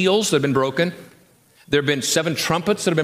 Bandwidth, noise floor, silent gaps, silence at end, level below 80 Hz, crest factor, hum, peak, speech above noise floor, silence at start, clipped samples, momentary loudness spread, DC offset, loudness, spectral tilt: 15.5 kHz; -54 dBFS; none; 0 s; -58 dBFS; 16 dB; none; -4 dBFS; 35 dB; 0 s; under 0.1%; 4 LU; under 0.1%; -20 LUFS; -4 dB/octave